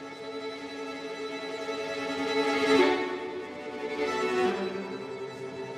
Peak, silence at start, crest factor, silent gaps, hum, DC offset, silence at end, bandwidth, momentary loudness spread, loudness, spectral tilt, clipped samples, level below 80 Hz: -10 dBFS; 0 s; 20 dB; none; none; under 0.1%; 0 s; 14 kHz; 14 LU; -30 LUFS; -4 dB/octave; under 0.1%; -74 dBFS